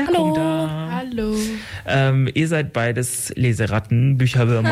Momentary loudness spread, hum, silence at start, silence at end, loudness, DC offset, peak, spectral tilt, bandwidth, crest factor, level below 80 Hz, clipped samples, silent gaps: 7 LU; none; 0 s; 0 s; -20 LUFS; under 0.1%; -8 dBFS; -6 dB/octave; 15.5 kHz; 12 dB; -44 dBFS; under 0.1%; none